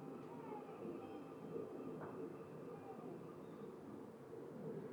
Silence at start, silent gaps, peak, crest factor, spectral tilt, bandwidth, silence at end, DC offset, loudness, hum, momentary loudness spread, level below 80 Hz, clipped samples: 0 s; none; -36 dBFS; 14 dB; -8 dB/octave; over 20 kHz; 0 s; under 0.1%; -52 LUFS; none; 4 LU; -86 dBFS; under 0.1%